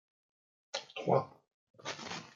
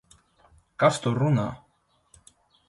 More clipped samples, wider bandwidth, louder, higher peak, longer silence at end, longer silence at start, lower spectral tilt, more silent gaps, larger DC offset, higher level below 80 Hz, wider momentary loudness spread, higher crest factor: neither; second, 9.2 kHz vs 11.5 kHz; second, -37 LUFS vs -24 LUFS; second, -14 dBFS vs -6 dBFS; second, 0.05 s vs 1.1 s; about the same, 0.75 s vs 0.8 s; second, -4.5 dB/octave vs -6.5 dB/octave; first, 1.54-1.74 s vs none; neither; second, -82 dBFS vs -60 dBFS; second, 14 LU vs 23 LU; about the same, 24 dB vs 22 dB